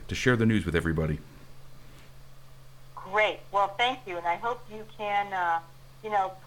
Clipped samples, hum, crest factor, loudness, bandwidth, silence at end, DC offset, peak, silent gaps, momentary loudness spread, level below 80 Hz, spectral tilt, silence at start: under 0.1%; none; 20 dB; -28 LUFS; 18.5 kHz; 0 s; under 0.1%; -8 dBFS; none; 13 LU; -48 dBFS; -5.5 dB/octave; 0 s